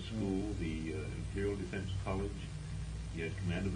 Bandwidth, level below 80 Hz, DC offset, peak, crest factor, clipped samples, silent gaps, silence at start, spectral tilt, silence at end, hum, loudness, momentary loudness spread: 10.5 kHz; -46 dBFS; under 0.1%; -24 dBFS; 14 dB; under 0.1%; none; 0 s; -6.5 dB/octave; 0 s; none; -39 LUFS; 6 LU